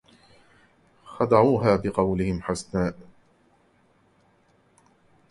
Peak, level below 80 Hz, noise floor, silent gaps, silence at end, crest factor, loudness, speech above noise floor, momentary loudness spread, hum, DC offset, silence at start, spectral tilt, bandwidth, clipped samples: -4 dBFS; -48 dBFS; -62 dBFS; none; 2.3 s; 24 dB; -23 LUFS; 40 dB; 11 LU; none; under 0.1%; 1.1 s; -7 dB/octave; 11.5 kHz; under 0.1%